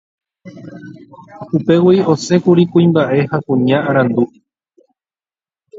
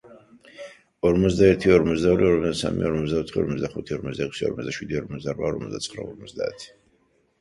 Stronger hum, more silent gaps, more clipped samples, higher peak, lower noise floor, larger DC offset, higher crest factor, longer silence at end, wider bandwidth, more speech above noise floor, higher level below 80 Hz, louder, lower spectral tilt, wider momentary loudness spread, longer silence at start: neither; neither; neither; first, 0 dBFS vs -4 dBFS; first, under -90 dBFS vs -65 dBFS; neither; about the same, 16 dB vs 20 dB; second, 0 s vs 0.75 s; second, 7.8 kHz vs 11.5 kHz; first, over 76 dB vs 42 dB; second, -56 dBFS vs -44 dBFS; first, -13 LUFS vs -23 LUFS; about the same, -7.5 dB/octave vs -6.5 dB/octave; first, 23 LU vs 18 LU; first, 0.45 s vs 0.1 s